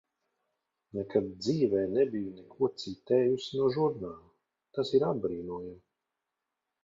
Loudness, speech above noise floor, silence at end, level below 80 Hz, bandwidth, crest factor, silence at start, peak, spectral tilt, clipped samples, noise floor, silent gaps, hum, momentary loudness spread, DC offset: -31 LUFS; 57 dB; 1.05 s; -66 dBFS; 7.6 kHz; 20 dB; 0.95 s; -12 dBFS; -7 dB/octave; under 0.1%; -87 dBFS; none; none; 14 LU; under 0.1%